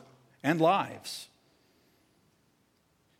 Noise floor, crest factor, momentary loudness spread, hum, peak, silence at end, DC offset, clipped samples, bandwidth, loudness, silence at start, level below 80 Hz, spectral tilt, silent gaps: -70 dBFS; 22 dB; 17 LU; none; -12 dBFS; 1.95 s; under 0.1%; under 0.1%; 16 kHz; -30 LUFS; 0.45 s; -82 dBFS; -5.5 dB/octave; none